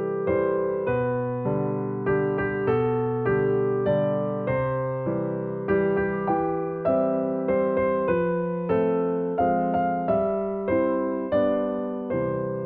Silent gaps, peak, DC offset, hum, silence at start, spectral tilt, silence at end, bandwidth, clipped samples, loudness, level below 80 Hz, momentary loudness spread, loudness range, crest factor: none; -10 dBFS; under 0.1%; none; 0 s; -8 dB/octave; 0 s; 4.3 kHz; under 0.1%; -25 LUFS; -52 dBFS; 4 LU; 1 LU; 14 dB